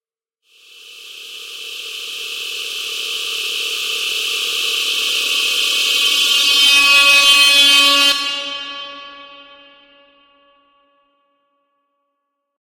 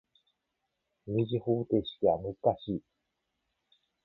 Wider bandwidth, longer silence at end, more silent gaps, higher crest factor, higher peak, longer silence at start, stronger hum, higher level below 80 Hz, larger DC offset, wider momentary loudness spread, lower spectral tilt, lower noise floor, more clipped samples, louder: first, 16.5 kHz vs 4.3 kHz; first, 3.15 s vs 1.25 s; neither; about the same, 16 dB vs 20 dB; first, -2 dBFS vs -14 dBFS; second, 0.85 s vs 1.05 s; neither; about the same, -58 dBFS vs -62 dBFS; neither; first, 21 LU vs 9 LU; second, 2.5 dB/octave vs -11 dB/octave; second, -74 dBFS vs -83 dBFS; neither; first, -12 LUFS vs -31 LUFS